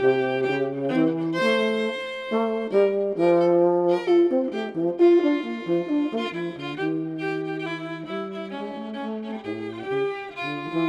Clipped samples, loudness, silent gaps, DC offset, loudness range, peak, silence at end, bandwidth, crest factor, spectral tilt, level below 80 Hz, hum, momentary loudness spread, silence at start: under 0.1%; -24 LUFS; none; under 0.1%; 9 LU; -8 dBFS; 0 s; 9.4 kHz; 16 dB; -7 dB/octave; -68 dBFS; none; 12 LU; 0 s